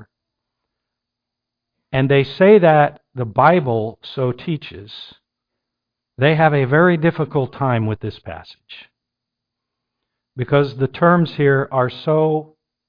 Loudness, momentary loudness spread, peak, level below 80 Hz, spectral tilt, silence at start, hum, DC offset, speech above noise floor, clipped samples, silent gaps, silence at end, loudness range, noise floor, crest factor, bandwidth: -16 LUFS; 15 LU; 0 dBFS; -52 dBFS; -10 dB/octave; 0 s; none; under 0.1%; 66 dB; under 0.1%; none; 0.45 s; 8 LU; -82 dBFS; 18 dB; 5.2 kHz